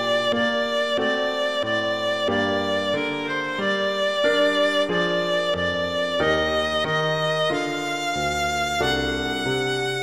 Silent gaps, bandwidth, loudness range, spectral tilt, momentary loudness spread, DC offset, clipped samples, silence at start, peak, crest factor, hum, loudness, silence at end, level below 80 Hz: none; 15.5 kHz; 2 LU; -4 dB/octave; 4 LU; 0.3%; under 0.1%; 0 s; -10 dBFS; 14 dB; none; -22 LUFS; 0 s; -46 dBFS